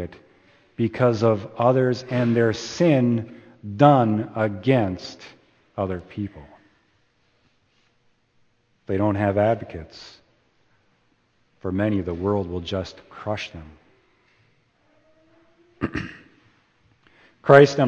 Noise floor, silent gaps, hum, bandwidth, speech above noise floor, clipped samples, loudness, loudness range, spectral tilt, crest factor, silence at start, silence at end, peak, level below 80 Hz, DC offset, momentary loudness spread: -65 dBFS; none; none; 8.2 kHz; 44 dB; under 0.1%; -22 LUFS; 16 LU; -7 dB/octave; 24 dB; 0 s; 0 s; 0 dBFS; -54 dBFS; under 0.1%; 21 LU